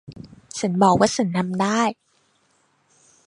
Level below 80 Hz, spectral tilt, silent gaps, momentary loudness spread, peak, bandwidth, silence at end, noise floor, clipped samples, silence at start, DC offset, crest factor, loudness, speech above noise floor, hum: -56 dBFS; -5 dB/octave; none; 13 LU; -2 dBFS; 11.5 kHz; 1.35 s; -64 dBFS; under 0.1%; 0.1 s; under 0.1%; 20 dB; -20 LUFS; 45 dB; none